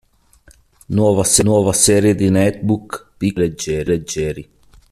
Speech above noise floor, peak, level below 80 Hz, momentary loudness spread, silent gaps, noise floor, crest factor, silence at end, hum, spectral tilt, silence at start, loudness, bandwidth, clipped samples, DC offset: 35 dB; 0 dBFS; -42 dBFS; 10 LU; none; -50 dBFS; 16 dB; 0.5 s; none; -4.5 dB/octave; 0.9 s; -16 LUFS; 14 kHz; under 0.1%; under 0.1%